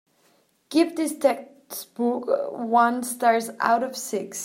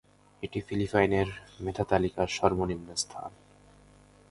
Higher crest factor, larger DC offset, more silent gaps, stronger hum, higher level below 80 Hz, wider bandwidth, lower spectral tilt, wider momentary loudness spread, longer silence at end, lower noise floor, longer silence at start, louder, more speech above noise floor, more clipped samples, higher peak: about the same, 20 dB vs 24 dB; neither; neither; second, none vs 50 Hz at -50 dBFS; second, -78 dBFS vs -50 dBFS; first, 16.5 kHz vs 11.5 kHz; second, -3 dB/octave vs -5 dB/octave; about the same, 10 LU vs 12 LU; second, 0 s vs 1 s; first, -64 dBFS vs -57 dBFS; first, 0.7 s vs 0.4 s; first, -24 LUFS vs -30 LUFS; first, 40 dB vs 28 dB; neither; about the same, -6 dBFS vs -6 dBFS